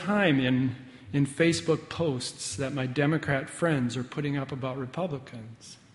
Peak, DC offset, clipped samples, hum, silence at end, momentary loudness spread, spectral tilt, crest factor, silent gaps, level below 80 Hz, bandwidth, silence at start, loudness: -10 dBFS; under 0.1%; under 0.1%; none; 0.2 s; 12 LU; -5.5 dB/octave; 18 dB; none; -60 dBFS; 11.5 kHz; 0 s; -28 LUFS